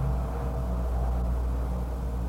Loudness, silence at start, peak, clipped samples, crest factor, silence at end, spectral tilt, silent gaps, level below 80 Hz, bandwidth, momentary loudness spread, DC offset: -31 LUFS; 0 s; -18 dBFS; under 0.1%; 10 dB; 0 s; -8.5 dB/octave; none; -28 dBFS; 9.2 kHz; 3 LU; under 0.1%